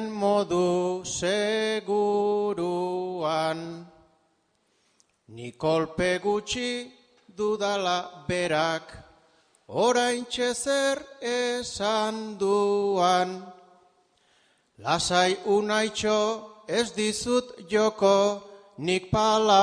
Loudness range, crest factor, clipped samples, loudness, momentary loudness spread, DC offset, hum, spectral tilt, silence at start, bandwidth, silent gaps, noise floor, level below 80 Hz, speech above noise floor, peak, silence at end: 5 LU; 20 dB; under 0.1%; -26 LUFS; 9 LU; under 0.1%; none; -4 dB/octave; 0 s; 10 kHz; none; -70 dBFS; -58 dBFS; 45 dB; -6 dBFS; 0 s